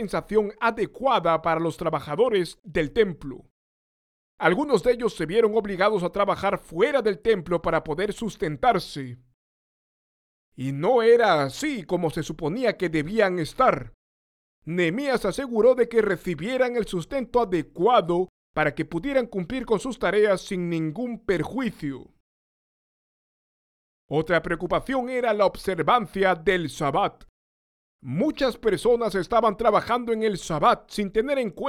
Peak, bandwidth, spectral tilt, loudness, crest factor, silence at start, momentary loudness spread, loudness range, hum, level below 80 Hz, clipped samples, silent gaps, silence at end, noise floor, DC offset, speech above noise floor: -6 dBFS; 14.5 kHz; -6 dB/octave; -24 LUFS; 20 dB; 0 s; 8 LU; 5 LU; none; -50 dBFS; under 0.1%; 3.50-4.38 s, 9.34-10.52 s, 13.94-14.62 s, 18.29-18.54 s, 22.20-24.09 s, 27.29-27.99 s; 0 s; under -90 dBFS; under 0.1%; over 66 dB